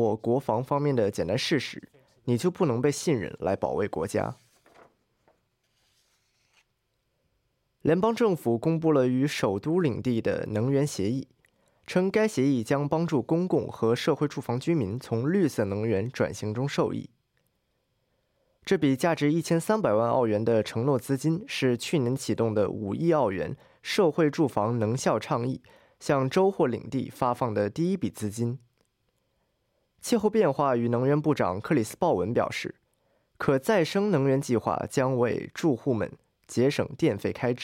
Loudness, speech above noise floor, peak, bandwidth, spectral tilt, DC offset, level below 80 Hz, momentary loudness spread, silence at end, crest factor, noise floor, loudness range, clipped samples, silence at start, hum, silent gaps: -27 LUFS; 50 dB; -10 dBFS; 16.5 kHz; -6.5 dB/octave; under 0.1%; -64 dBFS; 7 LU; 0 s; 18 dB; -76 dBFS; 5 LU; under 0.1%; 0 s; none; none